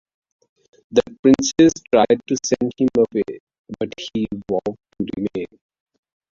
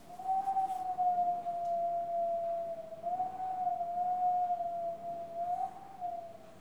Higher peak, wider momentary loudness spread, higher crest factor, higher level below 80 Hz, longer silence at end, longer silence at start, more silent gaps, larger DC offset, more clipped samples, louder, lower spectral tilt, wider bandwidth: first, -2 dBFS vs -24 dBFS; first, 14 LU vs 10 LU; first, 18 dB vs 12 dB; first, -52 dBFS vs -74 dBFS; first, 0.85 s vs 0 s; first, 0.9 s vs 0 s; first, 1.19-1.23 s, 3.40-3.47 s, 3.59-3.64 s vs none; second, under 0.1% vs 0.1%; neither; first, -20 LUFS vs -35 LUFS; about the same, -5 dB/octave vs -6 dB/octave; second, 7.6 kHz vs 12 kHz